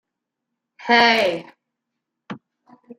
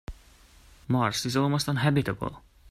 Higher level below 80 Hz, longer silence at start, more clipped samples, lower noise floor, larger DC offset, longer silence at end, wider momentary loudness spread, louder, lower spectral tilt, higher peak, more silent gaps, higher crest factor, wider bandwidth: second, -70 dBFS vs -50 dBFS; first, 0.8 s vs 0.1 s; neither; first, -82 dBFS vs -55 dBFS; neither; about the same, 0.05 s vs 0 s; first, 24 LU vs 11 LU; first, -16 LUFS vs -27 LUFS; second, -3.5 dB/octave vs -5.5 dB/octave; first, -2 dBFS vs -10 dBFS; neither; about the same, 22 dB vs 18 dB; about the same, 14.5 kHz vs 14.5 kHz